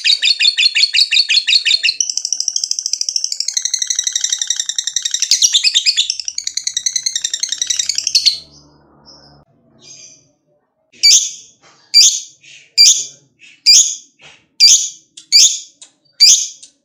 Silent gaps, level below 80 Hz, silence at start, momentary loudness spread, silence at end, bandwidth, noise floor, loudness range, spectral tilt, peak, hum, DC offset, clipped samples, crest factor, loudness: none; -66 dBFS; 0 s; 11 LU; 0.2 s; over 20 kHz; -62 dBFS; 7 LU; 6 dB/octave; 0 dBFS; none; under 0.1%; 0.2%; 16 dB; -11 LUFS